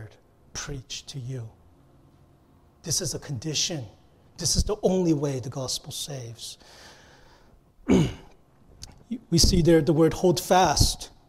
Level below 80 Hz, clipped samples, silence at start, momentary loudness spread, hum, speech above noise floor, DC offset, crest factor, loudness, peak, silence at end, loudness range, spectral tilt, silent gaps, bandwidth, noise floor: -38 dBFS; under 0.1%; 0 s; 19 LU; none; 33 dB; under 0.1%; 20 dB; -24 LUFS; -6 dBFS; 0.2 s; 9 LU; -4.5 dB/octave; none; 16 kHz; -58 dBFS